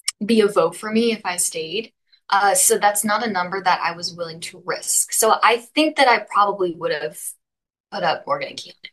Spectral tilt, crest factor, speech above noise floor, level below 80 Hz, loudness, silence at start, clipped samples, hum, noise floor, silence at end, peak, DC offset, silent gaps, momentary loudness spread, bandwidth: -2 dB/octave; 18 dB; 65 dB; -72 dBFS; -19 LUFS; 0.05 s; under 0.1%; none; -85 dBFS; 0.05 s; -2 dBFS; under 0.1%; 7.80-7.84 s; 14 LU; 13 kHz